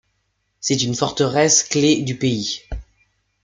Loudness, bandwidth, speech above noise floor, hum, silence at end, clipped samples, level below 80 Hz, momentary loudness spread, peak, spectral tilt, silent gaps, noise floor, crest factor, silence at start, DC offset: -18 LUFS; 10.5 kHz; 52 dB; 50 Hz at -50 dBFS; 0.6 s; under 0.1%; -42 dBFS; 14 LU; -2 dBFS; -3.5 dB/octave; none; -70 dBFS; 18 dB; 0.6 s; under 0.1%